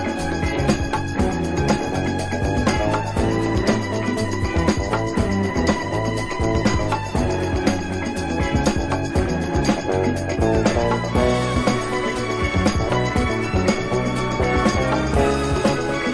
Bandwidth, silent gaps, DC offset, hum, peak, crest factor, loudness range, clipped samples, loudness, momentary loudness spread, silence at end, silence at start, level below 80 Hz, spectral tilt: 11 kHz; none; under 0.1%; none; -4 dBFS; 16 dB; 2 LU; under 0.1%; -21 LUFS; 4 LU; 0 s; 0 s; -30 dBFS; -6 dB/octave